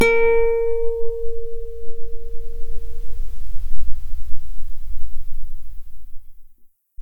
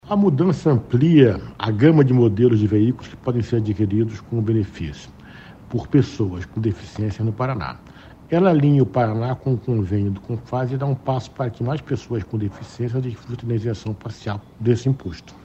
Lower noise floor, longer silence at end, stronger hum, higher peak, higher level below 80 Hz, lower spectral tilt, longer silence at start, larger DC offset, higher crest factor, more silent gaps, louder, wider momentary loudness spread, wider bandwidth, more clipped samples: first, -48 dBFS vs -42 dBFS; about the same, 0 s vs 0.1 s; neither; about the same, -2 dBFS vs 0 dBFS; first, -26 dBFS vs -46 dBFS; second, -5.5 dB/octave vs -9 dB/octave; about the same, 0 s vs 0.05 s; neither; second, 12 dB vs 20 dB; neither; second, -25 LUFS vs -21 LUFS; first, 21 LU vs 14 LU; second, 5.4 kHz vs 8 kHz; neither